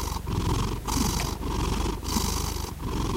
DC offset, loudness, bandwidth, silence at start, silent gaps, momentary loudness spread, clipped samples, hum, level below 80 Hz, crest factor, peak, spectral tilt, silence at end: under 0.1%; -29 LUFS; 16 kHz; 0 s; none; 5 LU; under 0.1%; none; -32 dBFS; 18 dB; -10 dBFS; -4.5 dB/octave; 0 s